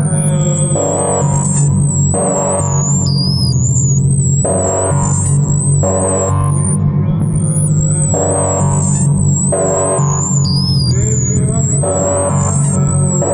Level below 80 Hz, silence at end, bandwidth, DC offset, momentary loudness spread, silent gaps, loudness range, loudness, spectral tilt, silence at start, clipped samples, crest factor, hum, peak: -34 dBFS; 0 s; 11 kHz; under 0.1%; 1 LU; none; 1 LU; -13 LUFS; -5.5 dB/octave; 0 s; under 0.1%; 12 dB; none; 0 dBFS